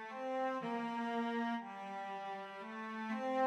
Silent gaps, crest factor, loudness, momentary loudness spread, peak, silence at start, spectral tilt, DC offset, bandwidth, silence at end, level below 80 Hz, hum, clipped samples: none; 14 dB; -41 LUFS; 8 LU; -26 dBFS; 0 s; -5.5 dB/octave; under 0.1%; 10 kHz; 0 s; under -90 dBFS; none; under 0.1%